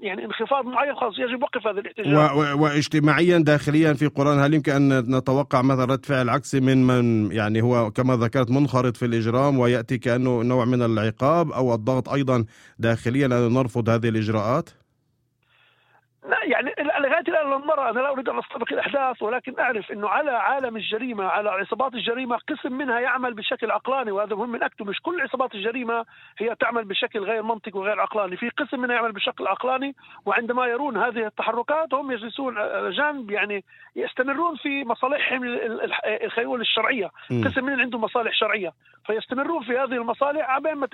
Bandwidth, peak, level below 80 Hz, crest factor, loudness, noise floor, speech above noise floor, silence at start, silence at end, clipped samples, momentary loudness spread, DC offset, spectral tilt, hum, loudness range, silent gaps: 12.5 kHz; -2 dBFS; -60 dBFS; 20 dB; -23 LUFS; -70 dBFS; 47 dB; 0 s; 0.05 s; under 0.1%; 8 LU; under 0.1%; -6.5 dB/octave; none; 6 LU; none